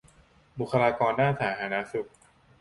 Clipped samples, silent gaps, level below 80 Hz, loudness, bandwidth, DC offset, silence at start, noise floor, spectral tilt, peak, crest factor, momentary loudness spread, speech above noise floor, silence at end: under 0.1%; none; -60 dBFS; -27 LUFS; 11.5 kHz; under 0.1%; 0.55 s; -59 dBFS; -7 dB/octave; -8 dBFS; 20 dB; 14 LU; 33 dB; 0.55 s